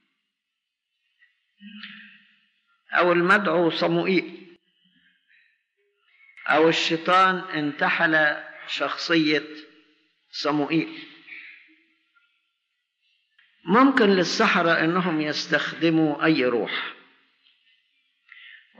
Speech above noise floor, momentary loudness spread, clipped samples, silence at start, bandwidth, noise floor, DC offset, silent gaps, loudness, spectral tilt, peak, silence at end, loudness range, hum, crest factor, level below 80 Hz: 61 dB; 22 LU; under 0.1%; 1.65 s; 8.2 kHz; -82 dBFS; under 0.1%; none; -21 LUFS; -5 dB/octave; -6 dBFS; 0.3 s; 10 LU; none; 18 dB; -76 dBFS